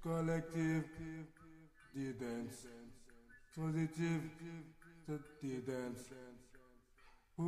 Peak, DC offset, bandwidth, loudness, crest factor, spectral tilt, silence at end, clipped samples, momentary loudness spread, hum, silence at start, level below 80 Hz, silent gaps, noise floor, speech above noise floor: -28 dBFS; under 0.1%; 14 kHz; -44 LUFS; 18 dB; -7 dB/octave; 0 s; under 0.1%; 22 LU; none; 0 s; -66 dBFS; none; -66 dBFS; 24 dB